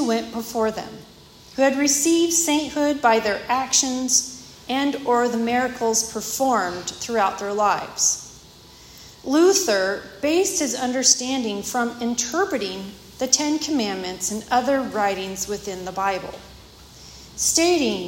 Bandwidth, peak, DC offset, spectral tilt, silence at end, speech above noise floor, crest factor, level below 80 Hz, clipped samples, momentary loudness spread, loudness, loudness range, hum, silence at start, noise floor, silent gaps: 16.5 kHz; -2 dBFS; under 0.1%; -2 dB/octave; 0 s; 25 dB; 22 dB; -54 dBFS; under 0.1%; 12 LU; -21 LUFS; 4 LU; none; 0 s; -46 dBFS; none